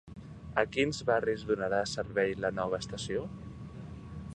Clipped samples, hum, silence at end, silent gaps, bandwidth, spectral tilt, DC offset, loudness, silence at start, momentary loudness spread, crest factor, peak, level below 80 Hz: under 0.1%; none; 0 s; none; 10 kHz; -5 dB/octave; under 0.1%; -32 LUFS; 0.05 s; 16 LU; 24 dB; -10 dBFS; -54 dBFS